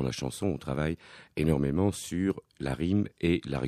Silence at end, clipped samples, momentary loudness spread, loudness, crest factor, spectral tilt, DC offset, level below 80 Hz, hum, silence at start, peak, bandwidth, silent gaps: 0 s; under 0.1%; 8 LU; -30 LUFS; 18 dB; -6.5 dB/octave; under 0.1%; -46 dBFS; none; 0 s; -12 dBFS; 15 kHz; none